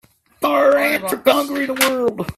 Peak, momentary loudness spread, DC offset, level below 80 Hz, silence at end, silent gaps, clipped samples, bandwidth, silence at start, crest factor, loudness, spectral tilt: 0 dBFS; 7 LU; under 0.1%; -52 dBFS; 0.05 s; none; under 0.1%; 16 kHz; 0.4 s; 18 dB; -17 LUFS; -3 dB/octave